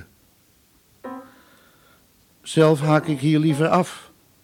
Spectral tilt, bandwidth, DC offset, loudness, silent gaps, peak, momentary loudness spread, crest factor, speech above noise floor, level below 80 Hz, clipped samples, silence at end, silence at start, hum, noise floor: -6.5 dB/octave; 15.5 kHz; under 0.1%; -19 LUFS; none; -4 dBFS; 23 LU; 18 dB; 40 dB; -64 dBFS; under 0.1%; 0.4 s; 0 s; none; -58 dBFS